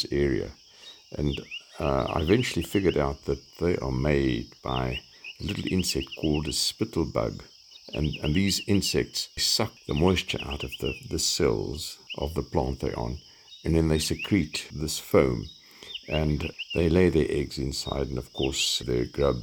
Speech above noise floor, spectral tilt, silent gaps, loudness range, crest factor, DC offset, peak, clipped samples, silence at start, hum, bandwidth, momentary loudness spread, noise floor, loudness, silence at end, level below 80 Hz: 23 dB; -4.5 dB/octave; none; 3 LU; 20 dB; under 0.1%; -8 dBFS; under 0.1%; 0 s; none; 19.5 kHz; 12 LU; -50 dBFS; -27 LUFS; 0 s; -42 dBFS